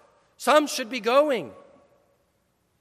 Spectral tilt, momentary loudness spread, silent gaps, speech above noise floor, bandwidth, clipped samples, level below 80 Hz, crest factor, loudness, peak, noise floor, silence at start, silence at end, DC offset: -2.5 dB/octave; 9 LU; none; 47 dB; 15.5 kHz; under 0.1%; -78 dBFS; 20 dB; -23 LUFS; -6 dBFS; -70 dBFS; 0.4 s; 1.25 s; under 0.1%